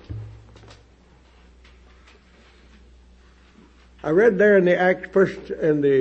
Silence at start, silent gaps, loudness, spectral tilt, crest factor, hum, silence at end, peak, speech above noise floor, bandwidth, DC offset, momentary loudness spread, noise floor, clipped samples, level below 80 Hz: 0.1 s; none; -19 LUFS; -8 dB/octave; 18 dB; none; 0 s; -6 dBFS; 35 dB; 7.8 kHz; under 0.1%; 21 LU; -53 dBFS; under 0.1%; -50 dBFS